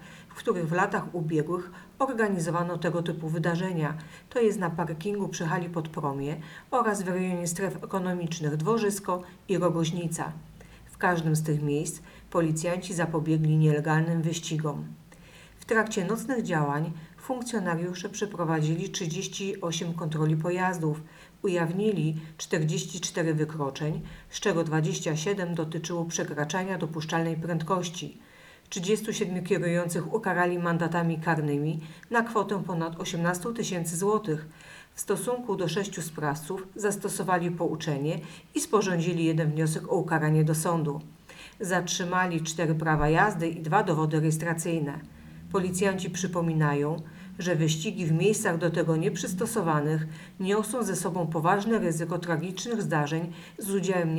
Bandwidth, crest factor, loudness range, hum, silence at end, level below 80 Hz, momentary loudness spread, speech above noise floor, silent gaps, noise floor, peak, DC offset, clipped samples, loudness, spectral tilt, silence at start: 18 kHz; 20 dB; 3 LU; none; 0 s; -56 dBFS; 9 LU; 23 dB; none; -51 dBFS; -8 dBFS; under 0.1%; under 0.1%; -28 LUFS; -5.5 dB/octave; 0 s